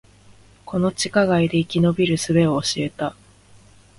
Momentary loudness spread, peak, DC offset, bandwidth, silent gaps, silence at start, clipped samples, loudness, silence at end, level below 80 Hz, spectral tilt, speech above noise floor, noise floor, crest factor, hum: 9 LU; -4 dBFS; under 0.1%; 11.5 kHz; none; 0.65 s; under 0.1%; -20 LUFS; 0.85 s; -50 dBFS; -5.5 dB/octave; 31 dB; -50 dBFS; 18 dB; none